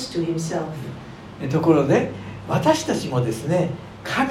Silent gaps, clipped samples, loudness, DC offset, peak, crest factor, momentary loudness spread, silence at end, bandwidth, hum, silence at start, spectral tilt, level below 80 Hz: none; under 0.1%; -22 LUFS; under 0.1%; -4 dBFS; 18 dB; 16 LU; 0 s; 15 kHz; none; 0 s; -6 dB/octave; -52 dBFS